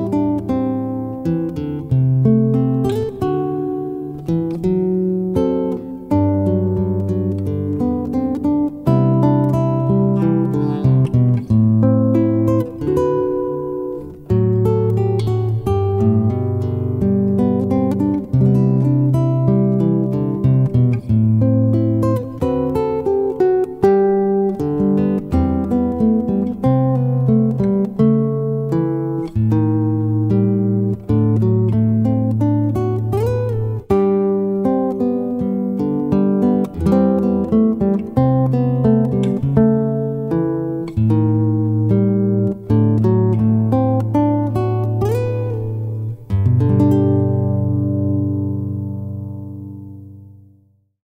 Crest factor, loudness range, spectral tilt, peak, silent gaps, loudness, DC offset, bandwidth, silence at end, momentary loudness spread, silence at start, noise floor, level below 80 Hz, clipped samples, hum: 14 dB; 3 LU; -11 dB/octave; -2 dBFS; none; -17 LUFS; under 0.1%; 5 kHz; 0.75 s; 7 LU; 0 s; -55 dBFS; -40 dBFS; under 0.1%; none